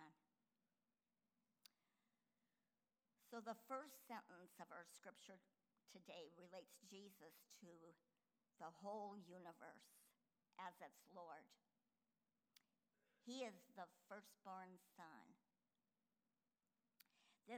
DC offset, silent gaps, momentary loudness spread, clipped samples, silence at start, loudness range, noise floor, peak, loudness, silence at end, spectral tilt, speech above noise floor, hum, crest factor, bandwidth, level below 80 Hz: under 0.1%; none; 12 LU; under 0.1%; 0 s; 6 LU; under -90 dBFS; -38 dBFS; -60 LUFS; 0 s; -4 dB/octave; over 30 dB; none; 24 dB; over 20 kHz; under -90 dBFS